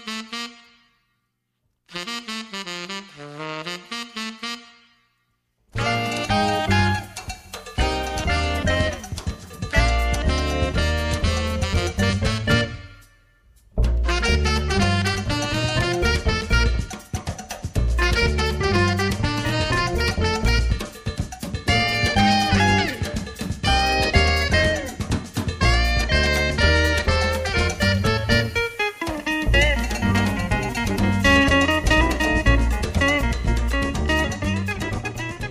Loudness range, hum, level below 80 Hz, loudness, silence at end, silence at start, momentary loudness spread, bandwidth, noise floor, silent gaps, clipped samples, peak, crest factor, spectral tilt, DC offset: 10 LU; none; -28 dBFS; -21 LUFS; 0 s; 0 s; 13 LU; 15.5 kHz; -74 dBFS; none; under 0.1%; -4 dBFS; 18 dB; -4.5 dB/octave; under 0.1%